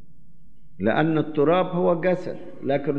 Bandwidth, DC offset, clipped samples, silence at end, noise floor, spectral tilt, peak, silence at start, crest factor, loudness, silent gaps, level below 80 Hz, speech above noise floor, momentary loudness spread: 6.8 kHz; 2%; under 0.1%; 0 s; -55 dBFS; -9 dB/octave; -8 dBFS; 0.8 s; 16 dB; -23 LUFS; none; -58 dBFS; 33 dB; 8 LU